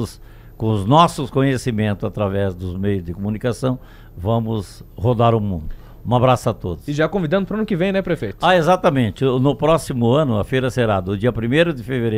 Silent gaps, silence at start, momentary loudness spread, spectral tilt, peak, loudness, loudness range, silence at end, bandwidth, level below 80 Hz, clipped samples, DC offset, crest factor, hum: none; 0 s; 10 LU; -7 dB/octave; 0 dBFS; -19 LUFS; 5 LU; 0 s; 15 kHz; -40 dBFS; under 0.1%; under 0.1%; 18 dB; none